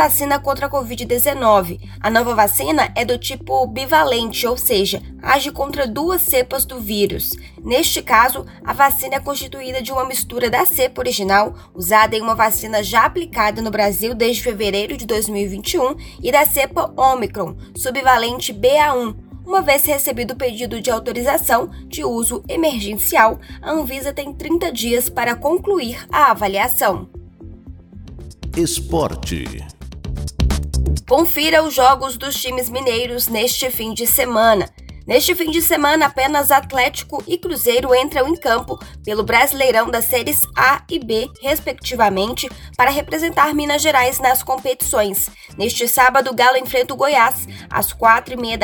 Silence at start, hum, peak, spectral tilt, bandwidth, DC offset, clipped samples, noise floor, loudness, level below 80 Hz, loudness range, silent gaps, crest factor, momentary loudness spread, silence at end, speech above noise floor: 0 s; none; 0 dBFS; -3 dB/octave; over 20 kHz; under 0.1%; under 0.1%; -37 dBFS; -17 LUFS; -34 dBFS; 3 LU; none; 18 dB; 10 LU; 0 s; 20 dB